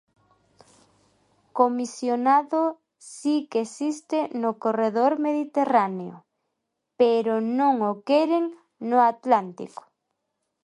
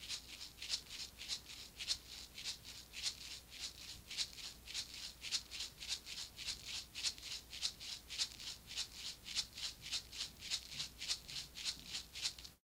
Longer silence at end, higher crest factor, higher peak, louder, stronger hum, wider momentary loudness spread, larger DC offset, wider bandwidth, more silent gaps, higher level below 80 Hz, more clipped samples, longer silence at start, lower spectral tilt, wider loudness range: first, 0.95 s vs 0.1 s; second, 20 dB vs 26 dB; first, -4 dBFS vs -22 dBFS; first, -23 LUFS vs -44 LUFS; neither; first, 15 LU vs 7 LU; neither; second, 11.5 kHz vs 16 kHz; neither; second, -80 dBFS vs -66 dBFS; neither; first, 1.55 s vs 0 s; first, -5.5 dB/octave vs 0.5 dB/octave; about the same, 3 LU vs 2 LU